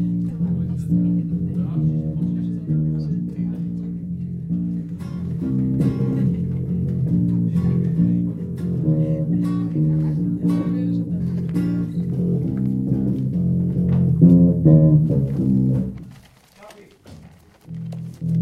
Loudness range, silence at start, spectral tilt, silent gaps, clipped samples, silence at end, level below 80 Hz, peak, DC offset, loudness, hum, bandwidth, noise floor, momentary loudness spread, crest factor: 8 LU; 0 s; -11 dB/octave; none; under 0.1%; 0 s; -42 dBFS; -2 dBFS; under 0.1%; -21 LUFS; none; 3 kHz; -47 dBFS; 12 LU; 18 dB